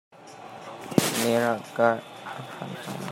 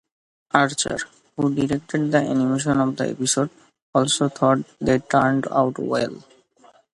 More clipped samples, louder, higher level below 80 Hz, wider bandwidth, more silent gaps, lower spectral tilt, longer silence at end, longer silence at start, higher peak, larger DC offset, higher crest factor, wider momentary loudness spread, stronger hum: neither; second, -26 LUFS vs -21 LUFS; second, -70 dBFS vs -54 dBFS; first, 16 kHz vs 11.5 kHz; second, none vs 3.82-3.93 s; about the same, -4.5 dB/octave vs -4.5 dB/octave; second, 0 s vs 0.75 s; second, 0.15 s vs 0.55 s; about the same, -2 dBFS vs 0 dBFS; neither; about the same, 24 dB vs 22 dB; first, 18 LU vs 6 LU; neither